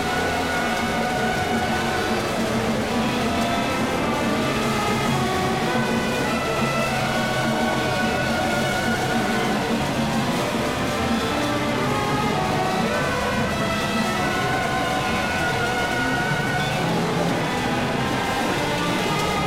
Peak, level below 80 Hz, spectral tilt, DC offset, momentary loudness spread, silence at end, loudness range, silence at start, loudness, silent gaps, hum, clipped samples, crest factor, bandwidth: -10 dBFS; -42 dBFS; -4.5 dB/octave; 0.3%; 1 LU; 0 s; 1 LU; 0 s; -22 LUFS; none; none; under 0.1%; 12 dB; 16.5 kHz